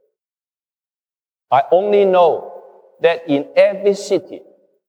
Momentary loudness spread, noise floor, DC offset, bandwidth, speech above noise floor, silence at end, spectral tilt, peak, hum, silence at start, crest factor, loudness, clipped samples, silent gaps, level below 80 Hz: 8 LU; under -90 dBFS; under 0.1%; 10 kHz; over 75 dB; 0.5 s; -5.5 dB/octave; -2 dBFS; none; 1.5 s; 16 dB; -16 LUFS; under 0.1%; none; -78 dBFS